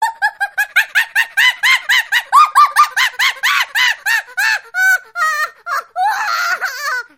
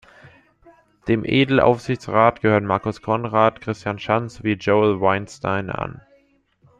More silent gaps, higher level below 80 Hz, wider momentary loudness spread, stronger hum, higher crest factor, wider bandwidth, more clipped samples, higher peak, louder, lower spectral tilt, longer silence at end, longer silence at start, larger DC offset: neither; second, -70 dBFS vs -52 dBFS; about the same, 8 LU vs 10 LU; neither; about the same, 14 dB vs 18 dB; first, 17 kHz vs 10 kHz; neither; about the same, 0 dBFS vs -2 dBFS; first, -13 LUFS vs -20 LUFS; second, 4 dB/octave vs -7 dB/octave; second, 0.15 s vs 0.85 s; second, 0 s vs 1.05 s; neither